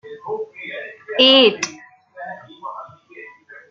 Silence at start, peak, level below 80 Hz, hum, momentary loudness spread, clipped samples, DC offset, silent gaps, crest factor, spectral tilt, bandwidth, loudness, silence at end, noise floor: 0.05 s; -2 dBFS; -70 dBFS; none; 24 LU; under 0.1%; under 0.1%; none; 20 dB; -2 dB/octave; 7.6 kHz; -15 LUFS; 0.2 s; -42 dBFS